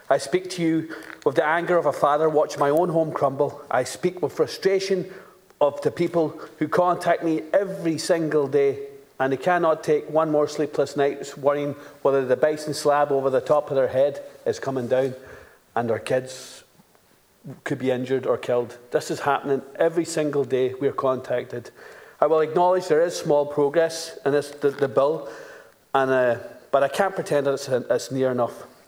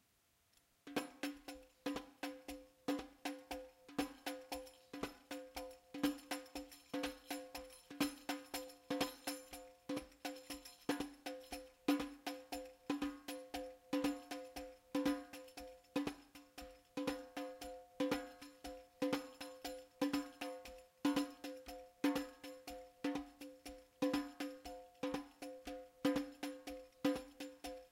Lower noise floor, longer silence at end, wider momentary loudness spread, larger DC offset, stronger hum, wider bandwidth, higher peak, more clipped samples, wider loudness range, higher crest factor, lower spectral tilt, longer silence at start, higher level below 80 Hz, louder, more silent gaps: second, -58 dBFS vs -77 dBFS; first, 0.2 s vs 0.05 s; second, 8 LU vs 14 LU; neither; neither; first, over 20 kHz vs 16.5 kHz; first, -4 dBFS vs -22 dBFS; neither; about the same, 4 LU vs 3 LU; about the same, 20 dB vs 24 dB; first, -5.5 dB/octave vs -3.5 dB/octave; second, 0.1 s vs 0.85 s; about the same, -70 dBFS vs -70 dBFS; first, -23 LUFS vs -45 LUFS; neither